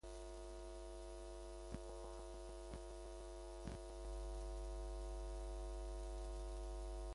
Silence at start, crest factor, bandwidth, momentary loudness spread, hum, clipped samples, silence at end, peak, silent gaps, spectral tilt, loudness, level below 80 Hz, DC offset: 0.05 s; 16 dB; 11.5 kHz; 4 LU; none; under 0.1%; 0 s; -34 dBFS; none; -5.5 dB/octave; -52 LUFS; -50 dBFS; under 0.1%